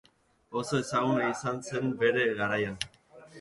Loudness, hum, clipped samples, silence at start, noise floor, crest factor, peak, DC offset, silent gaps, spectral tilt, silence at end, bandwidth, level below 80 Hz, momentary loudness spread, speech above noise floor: -30 LUFS; none; under 0.1%; 0.5 s; -59 dBFS; 18 dB; -12 dBFS; under 0.1%; none; -5 dB/octave; 0 s; 11.5 kHz; -64 dBFS; 10 LU; 30 dB